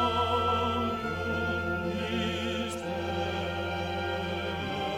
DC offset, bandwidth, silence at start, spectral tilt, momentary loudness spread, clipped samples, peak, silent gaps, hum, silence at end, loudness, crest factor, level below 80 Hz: under 0.1%; 16 kHz; 0 s; -5.5 dB/octave; 6 LU; under 0.1%; -16 dBFS; none; none; 0 s; -31 LUFS; 14 dB; -50 dBFS